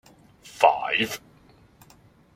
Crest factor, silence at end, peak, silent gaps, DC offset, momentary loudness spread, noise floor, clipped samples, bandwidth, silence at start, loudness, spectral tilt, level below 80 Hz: 24 dB; 1.2 s; -2 dBFS; none; under 0.1%; 18 LU; -55 dBFS; under 0.1%; 16 kHz; 0.45 s; -23 LUFS; -3 dB/octave; -64 dBFS